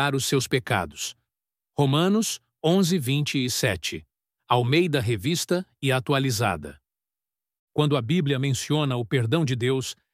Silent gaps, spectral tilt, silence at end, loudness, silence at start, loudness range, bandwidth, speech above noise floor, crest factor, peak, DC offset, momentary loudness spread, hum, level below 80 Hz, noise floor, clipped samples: 7.59-7.67 s; -5 dB/octave; 0.2 s; -24 LUFS; 0 s; 2 LU; 16 kHz; over 66 dB; 18 dB; -6 dBFS; under 0.1%; 9 LU; none; -56 dBFS; under -90 dBFS; under 0.1%